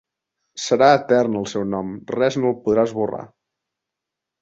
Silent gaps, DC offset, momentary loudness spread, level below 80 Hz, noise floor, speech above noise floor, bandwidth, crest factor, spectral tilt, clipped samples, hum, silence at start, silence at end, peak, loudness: none; under 0.1%; 13 LU; -60 dBFS; -84 dBFS; 65 dB; 8 kHz; 20 dB; -5.5 dB/octave; under 0.1%; none; 0.55 s; 1.15 s; -2 dBFS; -20 LUFS